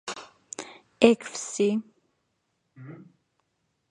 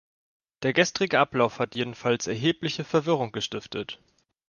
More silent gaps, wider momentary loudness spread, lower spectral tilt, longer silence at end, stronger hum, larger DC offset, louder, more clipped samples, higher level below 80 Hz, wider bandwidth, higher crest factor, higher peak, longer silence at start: neither; first, 25 LU vs 11 LU; about the same, -4 dB/octave vs -4.5 dB/octave; first, 0.95 s vs 0.55 s; neither; neither; about the same, -24 LUFS vs -26 LUFS; neither; second, -72 dBFS vs -64 dBFS; about the same, 11 kHz vs 10 kHz; first, 28 dB vs 22 dB; first, -2 dBFS vs -6 dBFS; second, 0.05 s vs 0.6 s